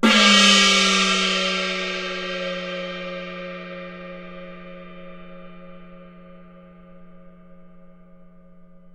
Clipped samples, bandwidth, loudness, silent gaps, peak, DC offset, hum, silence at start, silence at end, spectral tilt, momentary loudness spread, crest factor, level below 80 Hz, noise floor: under 0.1%; 13.5 kHz; -17 LUFS; none; 0 dBFS; under 0.1%; none; 0 s; 0.05 s; -2 dB/octave; 28 LU; 22 dB; -54 dBFS; -46 dBFS